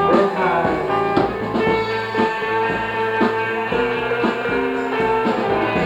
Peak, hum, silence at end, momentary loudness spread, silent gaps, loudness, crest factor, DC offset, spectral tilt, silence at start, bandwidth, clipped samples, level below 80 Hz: -2 dBFS; none; 0 s; 3 LU; none; -19 LUFS; 16 dB; under 0.1%; -6.5 dB/octave; 0 s; 10.5 kHz; under 0.1%; -46 dBFS